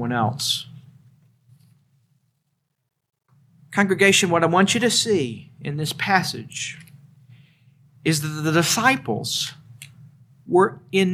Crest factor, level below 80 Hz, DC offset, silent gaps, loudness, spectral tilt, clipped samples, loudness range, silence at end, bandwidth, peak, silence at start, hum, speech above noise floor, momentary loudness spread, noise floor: 22 dB; -66 dBFS; under 0.1%; none; -20 LUFS; -3.5 dB/octave; under 0.1%; 10 LU; 0 s; 16 kHz; -2 dBFS; 0 s; none; 53 dB; 13 LU; -74 dBFS